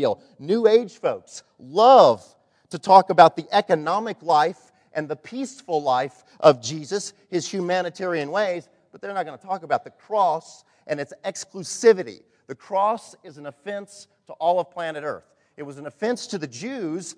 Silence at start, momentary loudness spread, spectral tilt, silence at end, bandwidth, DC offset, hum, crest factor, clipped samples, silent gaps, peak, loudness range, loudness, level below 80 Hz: 0 s; 19 LU; -4.5 dB/octave; 0.05 s; 10.5 kHz; under 0.1%; none; 22 dB; under 0.1%; none; 0 dBFS; 10 LU; -22 LUFS; -76 dBFS